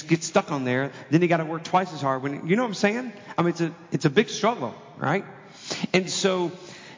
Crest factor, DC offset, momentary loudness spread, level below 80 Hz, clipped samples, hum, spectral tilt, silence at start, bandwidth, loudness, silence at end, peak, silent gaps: 20 dB; under 0.1%; 9 LU; -72 dBFS; under 0.1%; none; -5 dB/octave; 0 s; 7.6 kHz; -25 LUFS; 0 s; -6 dBFS; none